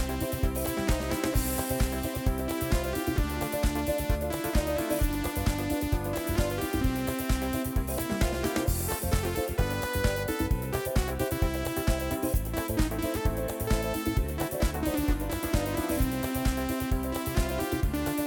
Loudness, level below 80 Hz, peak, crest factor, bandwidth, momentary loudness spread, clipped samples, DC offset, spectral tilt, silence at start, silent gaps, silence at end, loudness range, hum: -30 LUFS; -34 dBFS; -12 dBFS; 16 dB; 19.5 kHz; 2 LU; under 0.1%; under 0.1%; -5.5 dB/octave; 0 s; none; 0 s; 0 LU; none